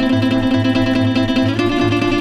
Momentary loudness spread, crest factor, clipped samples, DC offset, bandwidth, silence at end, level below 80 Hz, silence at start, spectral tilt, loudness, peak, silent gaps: 1 LU; 10 dB; under 0.1%; under 0.1%; 11 kHz; 0 s; -34 dBFS; 0 s; -6.5 dB/octave; -16 LUFS; -4 dBFS; none